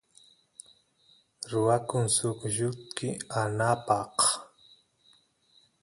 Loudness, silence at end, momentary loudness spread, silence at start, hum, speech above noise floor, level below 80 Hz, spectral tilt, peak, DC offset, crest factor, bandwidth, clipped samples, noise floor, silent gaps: -28 LUFS; 1.35 s; 14 LU; 1.4 s; none; 37 dB; -66 dBFS; -4 dB/octave; -10 dBFS; under 0.1%; 22 dB; 11.5 kHz; under 0.1%; -66 dBFS; none